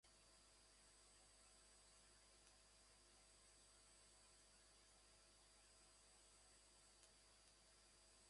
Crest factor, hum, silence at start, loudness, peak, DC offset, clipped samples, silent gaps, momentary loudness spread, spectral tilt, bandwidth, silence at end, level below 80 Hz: 26 dB; 50 Hz at -80 dBFS; 0 s; -70 LUFS; -46 dBFS; under 0.1%; under 0.1%; none; 1 LU; -1 dB/octave; 11.5 kHz; 0 s; -82 dBFS